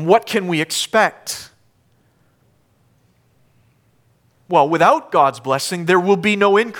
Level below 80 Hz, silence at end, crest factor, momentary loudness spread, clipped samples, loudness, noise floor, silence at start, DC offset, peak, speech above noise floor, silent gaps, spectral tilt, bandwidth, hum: -66 dBFS; 0 s; 18 dB; 7 LU; under 0.1%; -16 LUFS; -59 dBFS; 0 s; under 0.1%; -2 dBFS; 43 dB; none; -4 dB/octave; 18.5 kHz; none